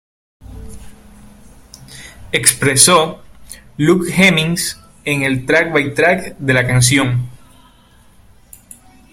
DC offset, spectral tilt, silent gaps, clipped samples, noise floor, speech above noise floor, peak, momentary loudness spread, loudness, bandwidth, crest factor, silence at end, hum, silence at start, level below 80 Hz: under 0.1%; -3.5 dB/octave; none; under 0.1%; -47 dBFS; 34 dB; 0 dBFS; 23 LU; -13 LUFS; 16.5 kHz; 16 dB; 1.75 s; none; 0.45 s; -42 dBFS